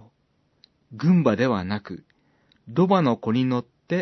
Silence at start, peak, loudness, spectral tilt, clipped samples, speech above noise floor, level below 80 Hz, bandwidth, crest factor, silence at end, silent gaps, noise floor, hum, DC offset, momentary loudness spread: 0.9 s; -6 dBFS; -23 LUFS; -8.5 dB/octave; under 0.1%; 46 dB; -66 dBFS; 6.2 kHz; 18 dB; 0 s; none; -67 dBFS; none; under 0.1%; 12 LU